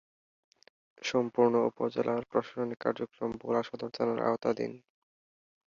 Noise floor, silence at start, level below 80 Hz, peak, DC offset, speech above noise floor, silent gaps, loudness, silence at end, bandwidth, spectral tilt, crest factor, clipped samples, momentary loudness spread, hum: under -90 dBFS; 1 s; -72 dBFS; -12 dBFS; under 0.1%; over 59 dB; none; -32 LUFS; 0.9 s; 7.4 kHz; -6 dB/octave; 20 dB; under 0.1%; 10 LU; none